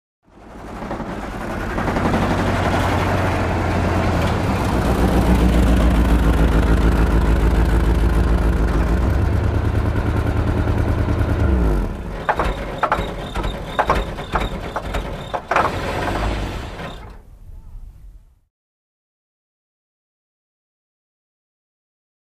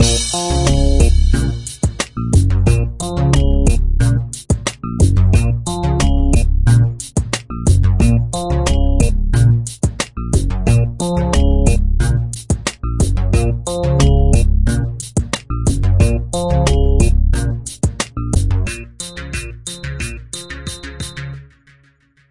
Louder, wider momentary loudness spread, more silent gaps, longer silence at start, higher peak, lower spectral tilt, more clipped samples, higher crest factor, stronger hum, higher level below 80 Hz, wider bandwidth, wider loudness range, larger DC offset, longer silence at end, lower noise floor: second, -20 LUFS vs -16 LUFS; about the same, 11 LU vs 12 LU; neither; first, 0.4 s vs 0 s; second, -4 dBFS vs 0 dBFS; first, -7 dB/octave vs -5.5 dB/octave; neither; about the same, 16 dB vs 14 dB; neither; about the same, -22 dBFS vs -18 dBFS; first, 14.5 kHz vs 11.5 kHz; about the same, 8 LU vs 6 LU; neither; first, 4.15 s vs 0.9 s; second, -43 dBFS vs -54 dBFS